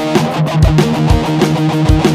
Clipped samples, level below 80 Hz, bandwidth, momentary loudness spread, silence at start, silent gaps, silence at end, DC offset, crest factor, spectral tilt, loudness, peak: 0.3%; -20 dBFS; 15.5 kHz; 3 LU; 0 s; none; 0 s; under 0.1%; 12 dB; -6.5 dB/octave; -12 LUFS; 0 dBFS